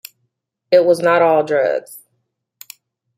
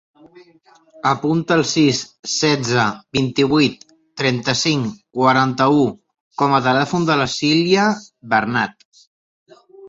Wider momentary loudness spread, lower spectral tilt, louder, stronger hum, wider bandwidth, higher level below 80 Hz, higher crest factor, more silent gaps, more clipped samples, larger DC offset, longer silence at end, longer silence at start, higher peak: about the same, 6 LU vs 7 LU; about the same, -5 dB/octave vs -4.5 dB/octave; about the same, -15 LUFS vs -17 LUFS; neither; first, 16 kHz vs 8 kHz; second, -70 dBFS vs -56 dBFS; about the same, 16 dB vs 16 dB; second, none vs 2.19-2.23 s, 6.20-6.31 s, 8.85-8.92 s, 9.07-9.46 s; neither; neither; first, 1.2 s vs 0 s; first, 0.7 s vs 0.35 s; about the same, -2 dBFS vs -2 dBFS